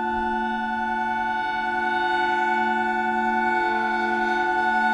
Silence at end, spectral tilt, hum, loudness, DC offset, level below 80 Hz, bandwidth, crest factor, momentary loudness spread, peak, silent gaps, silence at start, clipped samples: 0 s; -4.5 dB/octave; none; -23 LUFS; under 0.1%; -52 dBFS; 10 kHz; 12 dB; 3 LU; -10 dBFS; none; 0 s; under 0.1%